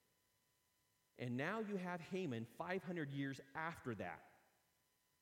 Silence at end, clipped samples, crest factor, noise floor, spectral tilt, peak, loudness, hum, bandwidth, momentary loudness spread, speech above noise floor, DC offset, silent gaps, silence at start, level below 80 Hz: 0.9 s; under 0.1%; 20 dB; -82 dBFS; -6.5 dB/octave; -30 dBFS; -46 LUFS; none; 16.5 kHz; 6 LU; 36 dB; under 0.1%; none; 1.2 s; -84 dBFS